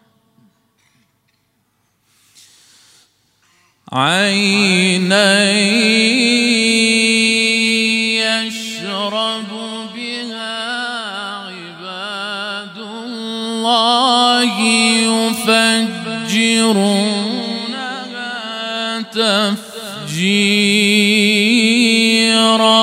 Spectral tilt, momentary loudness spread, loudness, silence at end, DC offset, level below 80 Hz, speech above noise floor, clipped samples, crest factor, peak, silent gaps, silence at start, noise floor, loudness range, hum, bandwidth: -3 dB/octave; 14 LU; -14 LUFS; 0 s; under 0.1%; -68 dBFS; 50 dB; under 0.1%; 16 dB; 0 dBFS; none; 3.9 s; -63 dBFS; 11 LU; none; 16 kHz